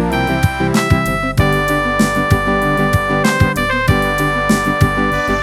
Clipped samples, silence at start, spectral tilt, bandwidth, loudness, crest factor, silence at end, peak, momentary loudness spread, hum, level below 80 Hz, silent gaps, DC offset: under 0.1%; 0 s; -5.5 dB/octave; 18 kHz; -14 LUFS; 14 dB; 0 s; 0 dBFS; 2 LU; none; -26 dBFS; none; under 0.1%